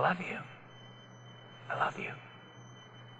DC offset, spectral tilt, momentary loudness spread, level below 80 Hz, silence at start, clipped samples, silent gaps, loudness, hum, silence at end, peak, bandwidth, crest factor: under 0.1%; -5.5 dB/octave; 19 LU; -78 dBFS; 0 s; under 0.1%; none; -37 LUFS; none; 0 s; -14 dBFS; 8.6 kHz; 24 dB